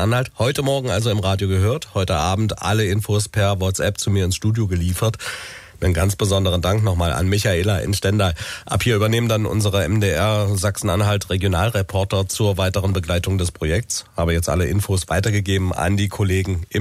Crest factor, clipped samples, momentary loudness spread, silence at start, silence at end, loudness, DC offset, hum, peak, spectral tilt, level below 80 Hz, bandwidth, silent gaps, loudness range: 12 dB; under 0.1%; 4 LU; 0 s; 0 s; -20 LUFS; under 0.1%; none; -6 dBFS; -5 dB/octave; -36 dBFS; 15.5 kHz; none; 2 LU